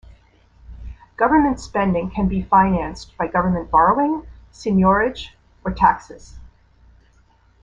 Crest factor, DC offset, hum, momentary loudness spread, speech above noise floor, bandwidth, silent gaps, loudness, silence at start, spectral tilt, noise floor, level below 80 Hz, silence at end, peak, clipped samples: 18 dB; under 0.1%; none; 18 LU; 37 dB; 7.8 kHz; none; -19 LUFS; 0.7 s; -7.5 dB/octave; -55 dBFS; -38 dBFS; 1.15 s; -2 dBFS; under 0.1%